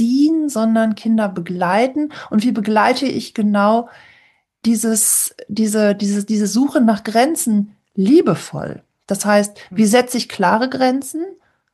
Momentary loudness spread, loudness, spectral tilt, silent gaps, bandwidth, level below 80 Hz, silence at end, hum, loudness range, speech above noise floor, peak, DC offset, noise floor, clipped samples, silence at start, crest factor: 9 LU; -16 LUFS; -4.5 dB/octave; none; 12.5 kHz; -62 dBFS; 0.4 s; none; 2 LU; 39 dB; 0 dBFS; under 0.1%; -55 dBFS; under 0.1%; 0 s; 16 dB